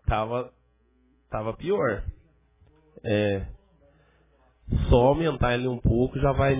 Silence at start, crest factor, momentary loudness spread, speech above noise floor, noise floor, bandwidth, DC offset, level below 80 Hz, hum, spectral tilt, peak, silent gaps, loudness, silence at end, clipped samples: 0.05 s; 20 dB; 15 LU; 40 dB; -64 dBFS; 3.8 kHz; under 0.1%; -36 dBFS; none; -11 dB/octave; -6 dBFS; none; -25 LUFS; 0 s; under 0.1%